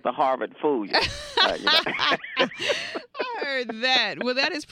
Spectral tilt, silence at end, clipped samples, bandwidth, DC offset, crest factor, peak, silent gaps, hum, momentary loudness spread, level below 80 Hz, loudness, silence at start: -2.5 dB/octave; 0.05 s; under 0.1%; 16 kHz; under 0.1%; 20 dB; -6 dBFS; none; none; 8 LU; -54 dBFS; -23 LUFS; 0.05 s